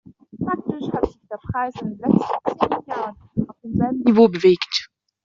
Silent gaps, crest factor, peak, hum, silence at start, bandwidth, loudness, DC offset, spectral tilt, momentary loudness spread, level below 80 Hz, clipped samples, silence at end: none; 18 dB; -2 dBFS; none; 0.35 s; 7.4 kHz; -21 LUFS; under 0.1%; -5 dB/octave; 13 LU; -48 dBFS; under 0.1%; 0.4 s